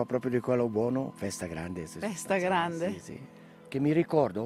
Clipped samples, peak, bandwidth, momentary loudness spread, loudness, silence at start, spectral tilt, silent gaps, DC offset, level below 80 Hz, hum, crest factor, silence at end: under 0.1%; -12 dBFS; 15.5 kHz; 12 LU; -30 LUFS; 0 s; -6 dB/octave; none; under 0.1%; -66 dBFS; none; 18 dB; 0 s